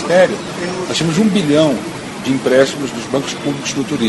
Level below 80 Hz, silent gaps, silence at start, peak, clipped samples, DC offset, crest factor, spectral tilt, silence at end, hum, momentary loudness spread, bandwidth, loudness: -50 dBFS; none; 0 s; 0 dBFS; under 0.1%; under 0.1%; 16 dB; -5 dB/octave; 0 s; none; 9 LU; 12 kHz; -16 LUFS